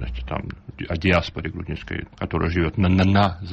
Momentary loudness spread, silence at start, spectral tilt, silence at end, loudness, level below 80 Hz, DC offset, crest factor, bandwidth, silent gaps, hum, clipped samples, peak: 14 LU; 0 s; -7.5 dB/octave; 0 s; -23 LUFS; -36 dBFS; under 0.1%; 16 dB; 7 kHz; none; none; under 0.1%; -6 dBFS